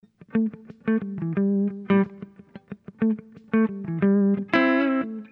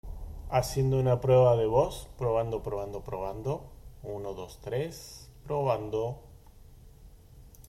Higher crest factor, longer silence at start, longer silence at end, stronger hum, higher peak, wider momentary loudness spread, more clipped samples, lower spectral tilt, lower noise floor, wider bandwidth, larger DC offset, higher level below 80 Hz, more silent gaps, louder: about the same, 18 dB vs 18 dB; first, 0.35 s vs 0.05 s; about the same, 0.05 s vs 0 s; neither; first, -6 dBFS vs -12 dBFS; second, 14 LU vs 21 LU; neither; first, -9.5 dB/octave vs -7 dB/octave; second, -43 dBFS vs -52 dBFS; second, 5.4 kHz vs 15 kHz; neither; second, -66 dBFS vs -48 dBFS; neither; first, -24 LUFS vs -29 LUFS